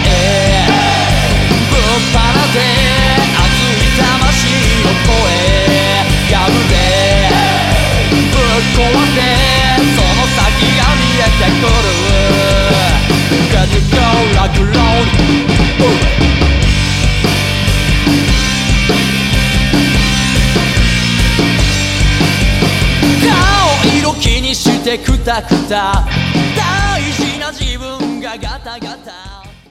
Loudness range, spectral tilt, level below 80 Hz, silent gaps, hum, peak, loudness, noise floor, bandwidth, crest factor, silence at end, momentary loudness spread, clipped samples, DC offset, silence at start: 3 LU; -4.5 dB/octave; -18 dBFS; none; none; 0 dBFS; -11 LUFS; -32 dBFS; 16 kHz; 10 dB; 0.2 s; 4 LU; under 0.1%; under 0.1%; 0 s